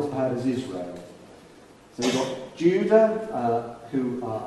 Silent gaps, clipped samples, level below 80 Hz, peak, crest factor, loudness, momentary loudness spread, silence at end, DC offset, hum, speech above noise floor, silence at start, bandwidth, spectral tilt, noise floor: none; under 0.1%; -62 dBFS; -6 dBFS; 20 dB; -25 LUFS; 17 LU; 0 s; under 0.1%; none; 26 dB; 0 s; 12 kHz; -5.5 dB/octave; -50 dBFS